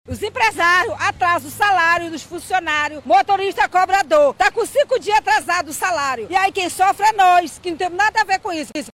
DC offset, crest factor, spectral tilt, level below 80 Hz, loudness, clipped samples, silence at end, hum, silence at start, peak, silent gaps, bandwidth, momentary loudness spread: under 0.1%; 12 dB; -2.5 dB/octave; -50 dBFS; -17 LUFS; under 0.1%; 0.05 s; none; 0.1 s; -6 dBFS; none; 16 kHz; 8 LU